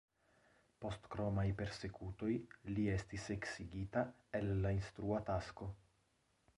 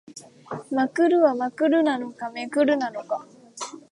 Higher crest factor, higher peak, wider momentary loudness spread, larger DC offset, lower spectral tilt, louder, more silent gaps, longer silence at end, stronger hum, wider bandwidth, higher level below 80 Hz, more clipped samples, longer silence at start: about the same, 18 dB vs 16 dB; second, -24 dBFS vs -8 dBFS; second, 9 LU vs 17 LU; neither; first, -7 dB/octave vs -4.5 dB/octave; second, -43 LUFS vs -23 LUFS; neither; first, 0.8 s vs 0.15 s; neither; about the same, 11 kHz vs 11.5 kHz; first, -56 dBFS vs -78 dBFS; neither; first, 0.8 s vs 0.1 s